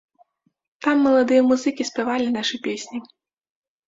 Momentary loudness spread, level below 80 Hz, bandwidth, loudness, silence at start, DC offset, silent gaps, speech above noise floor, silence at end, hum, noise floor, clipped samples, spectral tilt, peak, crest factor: 13 LU; -66 dBFS; 7.8 kHz; -20 LUFS; 0.8 s; under 0.1%; none; 41 dB; 0.85 s; none; -61 dBFS; under 0.1%; -3.5 dB/octave; -6 dBFS; 16 dB